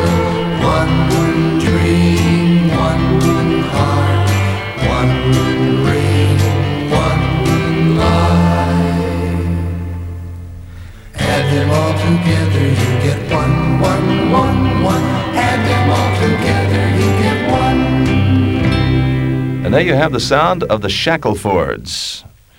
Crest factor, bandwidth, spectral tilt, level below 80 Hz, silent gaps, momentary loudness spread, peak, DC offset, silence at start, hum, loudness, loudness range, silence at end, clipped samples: 12 dB; 15.5 kHz; -6.5 dB/octave; -28 dBFS; none; 6 LU; 0 dBFS; under 0.1%; 0 s; none; -14 LUFS; 3 LU; 0.35 s; under 0.1%